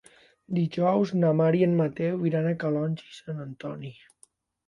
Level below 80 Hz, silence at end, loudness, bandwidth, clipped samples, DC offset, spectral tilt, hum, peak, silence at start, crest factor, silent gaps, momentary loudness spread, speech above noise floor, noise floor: -68 dBFS; 0.75 s; -26 LUFS; 10.5 kHz; under 0.1%; under 0.1%; -9 dB/octave; none; -12 dBFS; 0.5 s; 16 dB; none; 15 LU; 36 dB; -62 dBFS